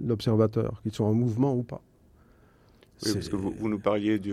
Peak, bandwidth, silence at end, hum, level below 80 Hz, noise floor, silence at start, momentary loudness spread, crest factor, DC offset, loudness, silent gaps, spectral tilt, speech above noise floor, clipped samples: -10 dBFS; 14.5 kHz; 0 s; none; -56 dBFS; -59 dBFS; 0 s; 8 LU; 18 dB; under 0.1%; -28 LUFS; none; -7 dB/octave; 32 dB; under 0.1%